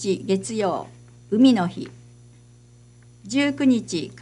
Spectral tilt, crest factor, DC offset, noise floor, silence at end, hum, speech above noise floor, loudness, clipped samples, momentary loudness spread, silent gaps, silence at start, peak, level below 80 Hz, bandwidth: -5.5 dB/octave; 18 dB; under 0.1%; -50 dBFS; 0.05 s; 60 Hz at -45 dBFS; 29 dB; -22 LUFS; under 0.1%; 16 LU; none; 0 s; -6 dBFS; -60 dBFS; 11 kHz